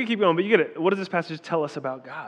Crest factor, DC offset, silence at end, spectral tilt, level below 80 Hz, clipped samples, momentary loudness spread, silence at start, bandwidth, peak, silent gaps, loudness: 20 dB; under 0.1%; 0 s; -6.5 dB/octave; under -90 dBFS; under 0.1%; 10 LU; 0 s; 9.6 kHz; -4 dBFS; none; -24 LUFS